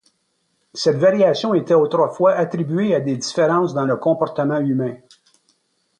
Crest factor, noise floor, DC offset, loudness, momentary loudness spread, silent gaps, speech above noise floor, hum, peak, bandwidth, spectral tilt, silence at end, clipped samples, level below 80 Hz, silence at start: 14 dB; -68 dBFS; under 0.1%; -18 LUFS; 6 LU; none; 51 dB; none; -4 dBFS; 10 kHz; -6 dB/octave; 1.05 s; under 0.1%; -66 dBFS; 0.75 s